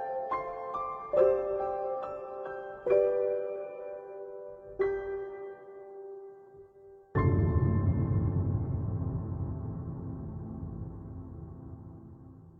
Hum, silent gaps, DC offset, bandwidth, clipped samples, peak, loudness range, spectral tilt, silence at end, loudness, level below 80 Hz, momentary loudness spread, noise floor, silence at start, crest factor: none; none; under 0.1%; 4.3 kHz; under 0.1%; -12 dBFS; 9 LU; -11.5 dB/octave; 0 s; -32 LUFS; -48 dBFS; 19 LU; -55 dBFS; 0 s; 20 dB